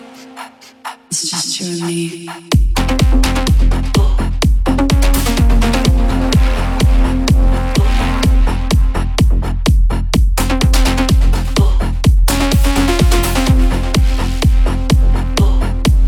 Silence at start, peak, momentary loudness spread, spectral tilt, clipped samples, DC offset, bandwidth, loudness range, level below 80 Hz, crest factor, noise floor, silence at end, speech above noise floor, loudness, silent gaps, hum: 0 s; 0 dBFS; 6 LU; -5 dB/octave; under 0.1%; under 0.1%; 17 kHz; 2 LU; -14 dBFS; 12 dB; -34 dBFS; 0 s; 21 dB; -14 LUFS; none; none